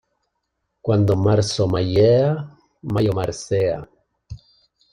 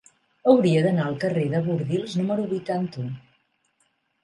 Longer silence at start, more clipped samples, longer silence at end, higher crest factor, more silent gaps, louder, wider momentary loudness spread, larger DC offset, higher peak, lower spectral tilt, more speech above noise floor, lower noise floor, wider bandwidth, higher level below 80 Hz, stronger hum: first, 0.85 s vs 0.45 s; neither; second, 0.55 s vs 1.05 s; about the same, 16 dB vs 20 dB; neither; first, -19 LUFS vs -23 LUFS; about the same, 14 LU vs 12 LU; neither; about the same, -4 dBFS vs -4 dBFS; second, -6.5 dB/octave vs -8 dB/octave; first, 57 dB vs 47 dB; first, -75 dBFS vs -70 dBFS; about the same, 10.5 kHz vs 11 kHz; first, -46 dBFS vs -66 dBFS; neither